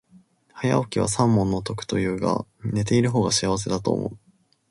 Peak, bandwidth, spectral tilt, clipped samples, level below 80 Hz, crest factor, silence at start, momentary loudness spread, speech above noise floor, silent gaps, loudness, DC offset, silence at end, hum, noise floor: -6 dBFS; 11.5 kHz; -5.5 dB/octave; under 0.1%; -48 dBFS; 18 dB; 0.55 s; 8 LU; 33 dB; none; -23 LUFS; under 0.1%; 0.55 s; none; -56 dBFS